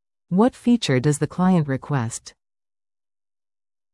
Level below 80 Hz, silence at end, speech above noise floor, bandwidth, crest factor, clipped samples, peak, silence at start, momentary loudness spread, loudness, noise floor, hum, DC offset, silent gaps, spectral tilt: -56 dBFS; 1.65 s; over 70 dB; 12 kHz; 16 dB; under 0.1%; -6 dBFS; 0.3 s; 7 LU; -21 LUFS; under -90 dBFS; none; under 0.1%; none; -6 dB/octave